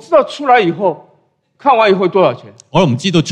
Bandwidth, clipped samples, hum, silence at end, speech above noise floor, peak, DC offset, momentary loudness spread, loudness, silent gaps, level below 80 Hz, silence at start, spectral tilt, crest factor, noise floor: 10 kHz; under 0.1%; none; 0 s; 44 dB; 0 dBFS; under 0.1%; 8 LU; -13 LUFS; none; -50 dBFS; 0.1 s; -6 dB/octave; 12 dB; -56 dBFS